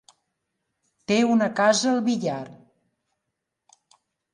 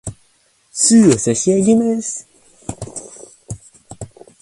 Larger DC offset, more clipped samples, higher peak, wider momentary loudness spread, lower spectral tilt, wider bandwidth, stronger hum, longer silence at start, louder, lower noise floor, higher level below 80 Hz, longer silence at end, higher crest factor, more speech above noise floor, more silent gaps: neither; neither; second, -6 dBFS vs 0 dBFS; second, 17 LU vs 24 LU; about the same, -4 dB/octave vs -4.5 dB/octave; about the same, 11 kHz vs 11.5 kHz; neither; first, 1.1 s vs 0.05 s; second, -22 LUFS vs -14 LUFS; first, -82 dBFS vs -57 dBFS; second, -72 dBFS vs -48 dBFS; first, 1.8 s vs 0.35 s; about the same, 20 dB vs 18 dB; first, 60 dB vs 44 dB; neither